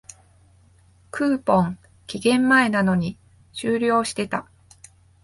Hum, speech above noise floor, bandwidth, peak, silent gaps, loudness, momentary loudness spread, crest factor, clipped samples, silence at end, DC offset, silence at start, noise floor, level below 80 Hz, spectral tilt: none; 35 dB; 11.5 kHz; -4 dBFS; none; -21 LUFS; 17 LU; 18 dB; under 0.1%; 0.8 s; under 0.1%; 1.15 s; -55 dBFS; -56 dBFS; -5.5 dB/octave